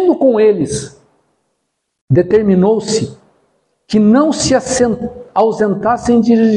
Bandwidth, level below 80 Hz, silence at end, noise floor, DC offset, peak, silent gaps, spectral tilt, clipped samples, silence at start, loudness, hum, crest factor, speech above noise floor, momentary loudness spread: 11 kHz; -44 dBFS; 0 s; -70 dBFS; under 0.1%; 0 dBFS; 2.01-2.08 s; -6 dB/octave; under 0.1%; 0 s; -13 LUFS; none; 12 dB; 58 dB; 9 LU